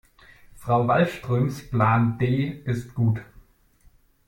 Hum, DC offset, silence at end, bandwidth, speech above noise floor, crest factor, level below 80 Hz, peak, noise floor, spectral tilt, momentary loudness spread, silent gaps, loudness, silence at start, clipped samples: none; under 0.1%; 1.05 s; 16 kHz; 35 dB; 18 dB; -50 dBFS; -6 dBFS; -58 dBFS; -8 dB/octave; 9 LU; none; -24 LUFS; 0.6 s; under 0.1%